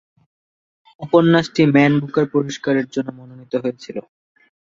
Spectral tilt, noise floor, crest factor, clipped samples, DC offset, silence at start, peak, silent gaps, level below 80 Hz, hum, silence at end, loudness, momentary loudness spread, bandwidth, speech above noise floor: -7 dB/octave; under -90 dBFS; 18 dB; under 0.1%; under 0.1%; 1 s; -2 dBFS; none; -60 dBFS; none; 0.7 s; -17 LUFS; 18 LU; 7.6 kHz; over 73 dB